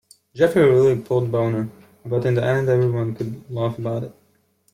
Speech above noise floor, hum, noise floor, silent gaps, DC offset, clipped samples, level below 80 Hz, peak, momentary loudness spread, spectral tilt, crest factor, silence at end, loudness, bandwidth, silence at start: 43 dB; none; -62 dBFS; none; under 0.1%; under 0.1%; -58 dBFS; -6 dBFS; 14 LU; -8 dB/octave; 16 dB; 0.65 s; -20 LUFS; 14.5 kHz; 0.35 s